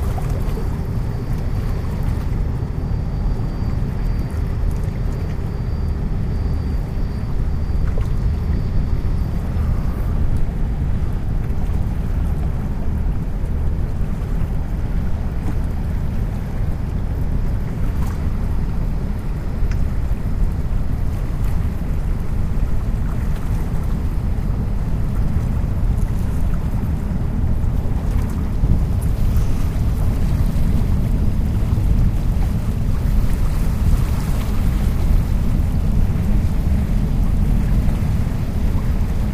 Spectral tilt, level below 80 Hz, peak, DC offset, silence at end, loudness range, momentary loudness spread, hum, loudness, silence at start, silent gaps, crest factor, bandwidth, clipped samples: -8 dB/octave; -20 dBFS; -2 dBFS; under 0.1%; 0 s; 4 LU; 4 LU; none; -22 LUFS; 0 s; none; 16 dB; 15 kHz; under 0.1%